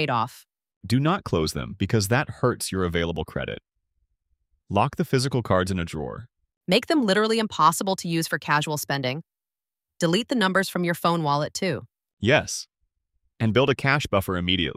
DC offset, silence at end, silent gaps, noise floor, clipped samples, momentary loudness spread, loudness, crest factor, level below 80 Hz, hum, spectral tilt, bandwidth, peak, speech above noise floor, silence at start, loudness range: under 0.1%; 0.05 s; 0.76-0.81 s, 6.57-6.61 s, 12.13-12.17 s; under -90 dBFS; under 0.1%; 11 LU; -24 LUFS; 20 dB; -50 dBFS; none; -5 dB/octave; 16 kHz; -4 dBFS; over 66 dB; 0 s; 4 LU